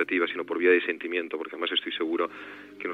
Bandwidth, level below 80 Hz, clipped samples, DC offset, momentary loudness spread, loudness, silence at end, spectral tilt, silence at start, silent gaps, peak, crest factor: 4.9 kHz; -88 dBFS; under 0.1%; under 0.1%; 13 LU; -27 LUFS; 0 s; -5 dB/octave; 0 s; none; -10 dBFS; 18 dB